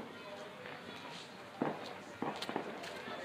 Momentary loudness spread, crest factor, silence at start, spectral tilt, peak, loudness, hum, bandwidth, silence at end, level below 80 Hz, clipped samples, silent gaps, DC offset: 8 LU; 24 dB; 0 s; -4.5 dB/octave; -20 dBFS; -44 LUFS; none; 15.5 kHz; 0 s; -82 dBFS; under 0.1%; none; under 0.1%